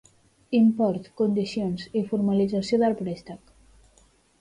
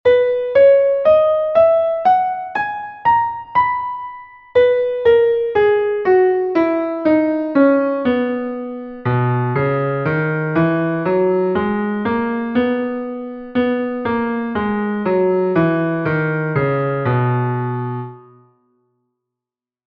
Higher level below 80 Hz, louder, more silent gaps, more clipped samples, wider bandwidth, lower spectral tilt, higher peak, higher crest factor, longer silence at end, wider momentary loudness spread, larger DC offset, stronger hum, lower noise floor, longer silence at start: second, -60 dBFS vs -52 dBFS; second, -25 LUFS vs -17 LUFS; neither; neither; first, 10.5 kHz vs 5.6 kHz; second, -7.5 dB/octave vs -10 dB/octave; second, -12 dBFS vs -2 dBFS; about the same, 14 dB vs 14 dB; second, 1.05 s vs 1.65 s; about the same, 12 LU vs 10 LU; neither; neither; second, -60 dBFS vs -88 dBFS; first, 0.5 s vs 0.05 s